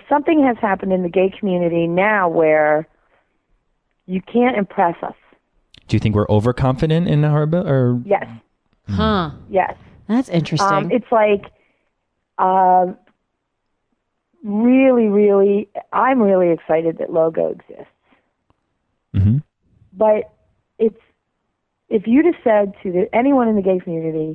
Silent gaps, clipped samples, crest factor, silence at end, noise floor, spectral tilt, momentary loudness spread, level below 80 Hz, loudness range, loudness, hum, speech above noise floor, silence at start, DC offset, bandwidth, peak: none; under 0.1%; 14 dB; 0 s; -73 dBFS; -8 dB/octave; 9 LU; -46 dBFS; 6 LU; -17 LUFS; none; 56 dB; 0.1 s; under 0.1%; 10 kHz; -4 dBFS